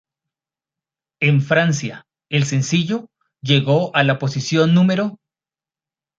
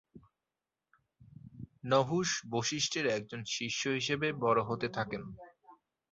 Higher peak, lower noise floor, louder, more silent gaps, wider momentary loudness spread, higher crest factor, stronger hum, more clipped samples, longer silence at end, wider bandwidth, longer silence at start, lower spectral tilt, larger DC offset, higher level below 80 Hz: first, -2 dBFS vs -14 dBFS; about the same, under -90 dBFS vs under -90 dBFS; first, -18 LUFS vs -33 LUFS; neither; second, 9 LU vs 16 LU; about the same, 18 dB vs 22 dB; neither; neither; first, 1.05 s vs 0.35 s; about the same, 7.8 kHz vs 8 kHz; first, 1.2 s vs 0.15 s; first, -5.5 dB/octave vs -3 dB/octave; neither; first, -60 dBFS vs -68 dBFS